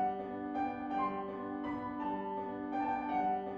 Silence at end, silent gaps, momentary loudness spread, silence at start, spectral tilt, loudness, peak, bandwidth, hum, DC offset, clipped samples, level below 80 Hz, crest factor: 0 s; none; 6 LU; 0 s; -8 dB/octave; -38 LUFS; -24 dBFS; 6.6 kHz; none; under 0.1%; under 0.1%; -66 dBFS; 14 dB